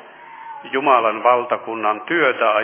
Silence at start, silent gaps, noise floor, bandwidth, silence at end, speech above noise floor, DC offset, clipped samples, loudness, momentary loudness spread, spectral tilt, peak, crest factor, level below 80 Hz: 0.05 s; none; -38 dBFS; 3.5 kHz; 0 s; 21 dB; under 0.1%; under 0.1%; -18 LUFS; 18 LU; -7.5 dB/octave; -2 dBFS; 18 dB; -80 dBFS